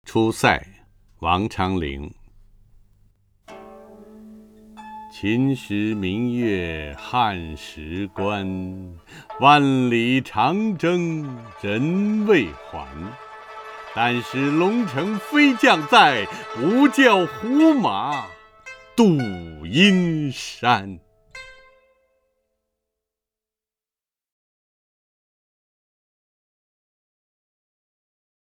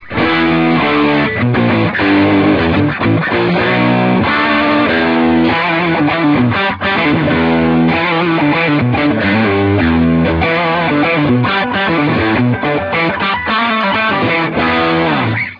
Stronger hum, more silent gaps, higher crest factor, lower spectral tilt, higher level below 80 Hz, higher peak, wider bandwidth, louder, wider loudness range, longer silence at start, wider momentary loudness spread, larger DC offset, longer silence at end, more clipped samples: neither; neither; first, 22 dB vs 12 dB; second, -5.5 dB/octave vs -8.5 dB/octave; second, -50 dBFS vs -36 dBFS; about the same, 0 dBFS vs 0 dBFS; first, 15 kHz vs 5.4 kHz; second, -20 LUFS vs -12 LUFS; first, 11 LU vs 1 LU; about the same, 0.05 s vs 0 s; first, 21 LU vs 2 LU; neither; first, 7 s vs 0 s; neither